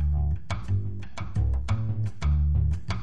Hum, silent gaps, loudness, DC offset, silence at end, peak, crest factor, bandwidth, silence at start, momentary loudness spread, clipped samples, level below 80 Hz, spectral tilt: none; none; -28 LUFS; 2%; 0 s; -14 dBFS; 12 dB; 8 kHz; 0 s; 8 LU; under 0.1%; -28 dBFS; -7.5 dB/octave